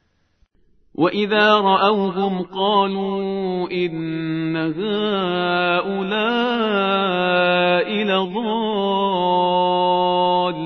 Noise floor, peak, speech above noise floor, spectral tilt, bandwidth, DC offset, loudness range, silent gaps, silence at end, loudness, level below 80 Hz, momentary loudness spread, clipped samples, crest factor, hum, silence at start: -61 dBFS; -2 dBFS; 43 dB; -7.5 dB/octave; 6.2 kHz; under 0.1%; 3 LU; none; 0 s; -19 LUFS; -60 dBFS; 7 LU; under 0.1%; 18 dB; none; 1 s